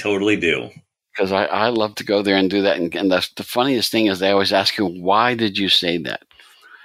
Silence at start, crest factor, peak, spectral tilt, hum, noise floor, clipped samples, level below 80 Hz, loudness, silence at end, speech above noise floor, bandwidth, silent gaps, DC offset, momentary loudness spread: 0 s; 18 dB; -2 dBFS; -4.5 dB/octave; none; -47 dBFS; under 0.1%; -62 dBFS; -18 LUFS; 0.65 s; 28 dB; 16 kHz; none; under 0.1%; 8 LU